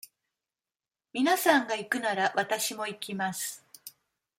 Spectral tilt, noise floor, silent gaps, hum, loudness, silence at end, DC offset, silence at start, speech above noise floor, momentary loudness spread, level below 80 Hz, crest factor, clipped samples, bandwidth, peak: -2.5 dB/octave; under -90 dBFS; none; none; -28 LUFS; 0.5 s; under 0.1%; 1.15 s; over 61 dB; 20 LU; -82 dBFS; 22 dB; under 0.1%; 16.5 kHz; -10 dBFS